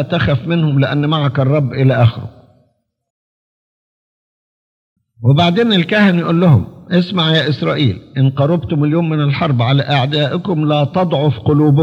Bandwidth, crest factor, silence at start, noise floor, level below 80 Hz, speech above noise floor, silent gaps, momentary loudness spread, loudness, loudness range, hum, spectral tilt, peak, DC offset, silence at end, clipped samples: 6.6 kHz; 14 dB; 0 s; -60 dBFS; -50 dBFS; 47 dB; 3.10-4.96 s; 5 LU; -14 LUFS; 7 LU; none; -8.5 dB/octave; 0 dBFS; under 0.1%; 0 s; under 0.1%